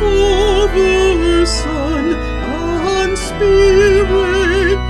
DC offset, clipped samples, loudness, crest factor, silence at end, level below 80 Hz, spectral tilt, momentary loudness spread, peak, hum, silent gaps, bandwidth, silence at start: under 0.1%; under 0.1%; -13 LUFS; 12 dB; 0 s; -22 dBFS; -5 dB/octave; 8 LU; 0 dBFS; none; none; 12 kHz; 0 s